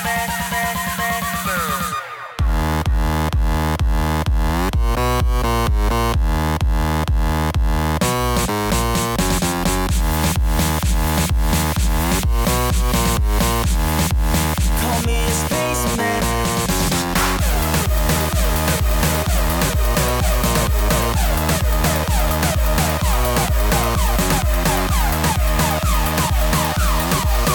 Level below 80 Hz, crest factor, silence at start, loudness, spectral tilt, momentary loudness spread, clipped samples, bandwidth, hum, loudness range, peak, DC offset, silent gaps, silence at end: -20 dBFS; 10 dB; 0 s; -19 LUFS; -4.5 dB/octave; 2 LU; under 0.1%; over 20 kHz; none; 2 LU; -8 dBFS; 0.1%; none; 0 s